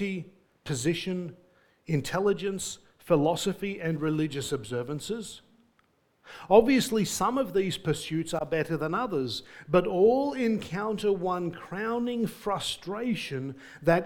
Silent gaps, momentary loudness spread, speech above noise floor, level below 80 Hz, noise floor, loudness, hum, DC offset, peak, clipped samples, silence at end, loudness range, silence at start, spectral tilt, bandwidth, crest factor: none; 13 LU; 41 dB; -58 dBFS; -68 dBFS; -28 LUFS; none; under 0.1%; -6 dBFS; under 0.1%; 0 s; 4 LU; 0 s; -5 dB/octave; 19 kHz; 22 dB